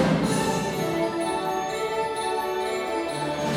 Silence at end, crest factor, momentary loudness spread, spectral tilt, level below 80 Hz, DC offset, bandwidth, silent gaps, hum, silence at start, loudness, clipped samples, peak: 0 s; 16 dB; 4 LU; -5 dB/octave; -52 dBFS; under 0.1%; 16.5 kHz; none; none; 0 s; -26 LUFS; under 0.1%; -10 dBFS